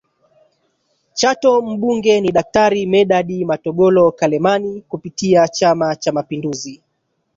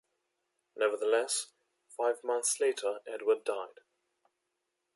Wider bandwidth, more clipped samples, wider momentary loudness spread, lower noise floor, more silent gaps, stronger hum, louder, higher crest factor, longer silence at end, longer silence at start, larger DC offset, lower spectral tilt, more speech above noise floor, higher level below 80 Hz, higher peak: second, 7.8 kHz vs 12 kHz; neither; about the same, 12 LU vs 11 LU; second, -69 dBFS vs -84 dBFS; neither; neither; first, -15 LUFS vs -32 LUFS; second, 14 dB vs 20 dB; second, 0.6 s vs 1.3 s; first, 1.15 s vs 0.75 s; neither; first, -5 dB/octave vs 0.5 dB/octave; about the same, 54 dB vs 52 dB; first, -54 dBFS vs under -90 dBFS; first, -2 dBFS vs -14 dBFS